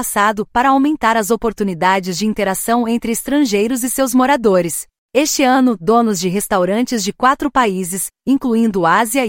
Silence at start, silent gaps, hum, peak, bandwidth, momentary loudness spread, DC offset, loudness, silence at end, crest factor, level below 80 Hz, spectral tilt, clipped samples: 0 s; 4.98-5.09 s; none; -2 dBFS; 16.5 kHz; 6 LU; under 0.1%; -15 LUFS; 0 s; 14 dB; -46 dBFS; -4 dB/octave; under 0.1%